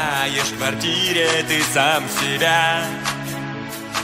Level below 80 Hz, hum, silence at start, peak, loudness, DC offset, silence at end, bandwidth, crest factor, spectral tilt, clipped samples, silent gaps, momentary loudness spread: -52 dBFS; none; 0 s; -4 dBFS; -19 LUFS; under 0.1%; 0 s; 16 kHz; 16 dB; -2.5 dB/octave; under 0.1%; none; 11 LU